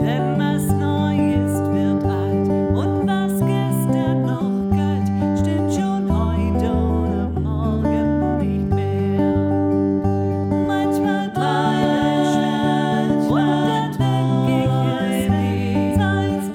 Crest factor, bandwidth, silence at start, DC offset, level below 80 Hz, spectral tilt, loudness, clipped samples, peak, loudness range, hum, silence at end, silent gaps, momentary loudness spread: 12 dB; 17.5 kHz; 0 s; under 0.1%; -38 dBFS; -7.5 dB/octave; -19 LUFS; under 0.1%; -6 dBFS; 1 LU; none; 0 s; none; 3 LU